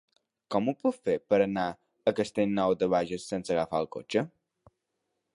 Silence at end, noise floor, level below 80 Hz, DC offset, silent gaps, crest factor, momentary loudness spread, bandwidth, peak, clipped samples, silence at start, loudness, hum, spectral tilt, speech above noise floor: 1.05 s; -82 dBFS; -64 dBFS; under 0.1%; none; 18 dB; 7 LU; 11.5 kHz; -12 dBFS; under 0.1%; 0.5 s; -29 LUFS; none; -6 dB/octave; 54 dB